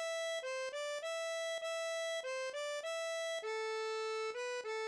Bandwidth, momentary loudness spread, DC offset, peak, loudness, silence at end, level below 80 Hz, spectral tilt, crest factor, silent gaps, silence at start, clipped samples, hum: 11 kHz; 2 LU; under 0.1%; -28 dBFS; -40 LUFS; 0 s; under -90 dBFS; 2.5 dB/octave; 12 dB; none; 0 s; under 0.1%; none